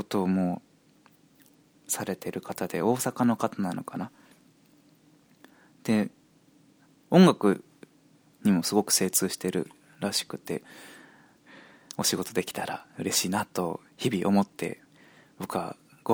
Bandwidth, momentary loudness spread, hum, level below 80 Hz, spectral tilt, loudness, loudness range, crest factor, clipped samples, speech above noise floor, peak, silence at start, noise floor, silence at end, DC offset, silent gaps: over 20 kHz; 15 LU; none; -70 dBFS; -4.5 dB/octave; -28 LUFS; 7 LU; 24 dB; under 0.1%; 34 dB; -6 dBFS; 0 s; -61 dBFS; 0 s; under 0.1%; none